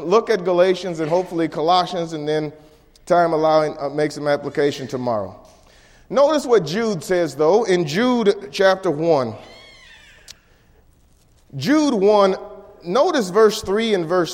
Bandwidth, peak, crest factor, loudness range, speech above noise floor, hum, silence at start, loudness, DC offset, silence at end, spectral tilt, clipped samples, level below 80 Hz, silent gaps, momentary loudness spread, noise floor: 16 kHz; -4 dBFS; 16 dB; 4 LU; 36 dB; none; 0 s; -19 LUFS; under 0.1%; 0 s; -5.5 dB/octave; under 0.1%; -54 dBFS; none; 9 LU; -54 dBFS